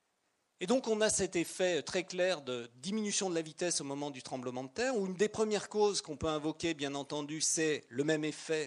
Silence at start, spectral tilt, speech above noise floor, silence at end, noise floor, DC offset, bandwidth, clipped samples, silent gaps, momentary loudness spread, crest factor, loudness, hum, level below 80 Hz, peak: 0.6 s; -3 dB/octave; 45 dB; 0 s; -79 dBFS; under 0.1%; 11.5 kHz; under 0.1%; none; 10 LU; 20 dB; -34 LUFS; none; -66 dBFS; -16 dBFS